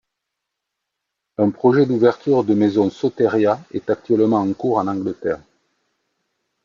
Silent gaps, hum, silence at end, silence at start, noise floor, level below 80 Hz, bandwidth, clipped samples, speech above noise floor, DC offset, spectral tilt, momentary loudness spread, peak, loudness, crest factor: none; none; 1.25 s; 1.4 s; -80 dBFS; -64 dBFS; 7.2 kHz; under 0.1%; 63 dB; under 0.1%; -8.5 dB/octave; 8 LU; -4 dBFS; -18 LUFS; 16 dB